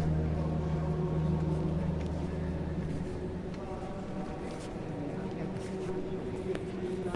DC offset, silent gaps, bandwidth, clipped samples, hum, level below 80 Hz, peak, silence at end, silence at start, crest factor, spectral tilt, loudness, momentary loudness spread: under 0.1%; none; 11 kHz; under 0.1%; none; -44 dBFS; -18 dBFS; 0 s; 0 s; 16 dB; -8.5 dB/octave; -35 LUFS; 8 LU